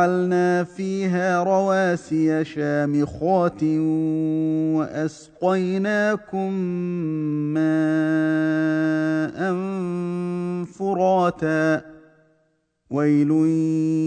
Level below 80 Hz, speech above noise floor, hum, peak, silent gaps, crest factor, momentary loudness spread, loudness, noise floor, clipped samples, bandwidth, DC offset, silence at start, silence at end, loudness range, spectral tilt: -60 dBFS; 46 dB; none; -6 dBFS; none; 16 dB; 7 LU; -22 LUFS; -67 dBFS; under 0.1%; 9.2 kHz; under 0.1%; 0 s; 0 s; 2 LU; -7.5 dB/octave